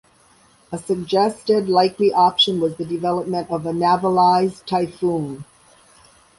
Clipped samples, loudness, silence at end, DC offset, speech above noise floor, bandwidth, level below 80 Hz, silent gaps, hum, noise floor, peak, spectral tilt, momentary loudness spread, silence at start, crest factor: under 0.1%; -19 LUFS; 0.95 s; under 0.1%; 35 dB; 11.5 kHz; -58 dBFS; none; none; -54 dBFS; -4 dBFS; -5.5 dB/octave; 10 LU; 0.7 s; 16 dB